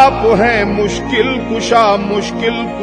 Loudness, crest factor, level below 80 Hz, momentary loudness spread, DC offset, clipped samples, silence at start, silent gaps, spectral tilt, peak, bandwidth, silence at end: -13 LUFS; 12 dB; -32 dBFS; 6 LU; under 0.1%; 0.2%; 0 s; none; -5 dB/octave; 0 dBFS; 10.5 kHz; 0 s